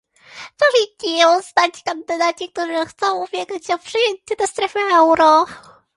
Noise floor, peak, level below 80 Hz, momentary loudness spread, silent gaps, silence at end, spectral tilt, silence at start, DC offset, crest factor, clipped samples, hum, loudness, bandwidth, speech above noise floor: -39 dBFS; 0 dBFS; -62 dBFS; 12 LU; none; 0.35 s; -1.5 dB/octave; 0.35 s; under 0.1%; 18 dB; under 0.1%; none; -17 LUFS; 11.5 kHz; 22 dB